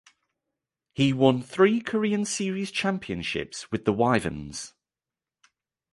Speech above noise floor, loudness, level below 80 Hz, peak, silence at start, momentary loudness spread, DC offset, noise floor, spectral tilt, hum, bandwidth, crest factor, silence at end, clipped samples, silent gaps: over 65 dB; -25 LUFS; -56 dBFS; -6 dBFS; 1 s; 14 LU; under 0.1%; under -90 dBFS; -5 dB/octave; none; 11.5 kHz; 22 dB; 1.25 s; under 0.1%; none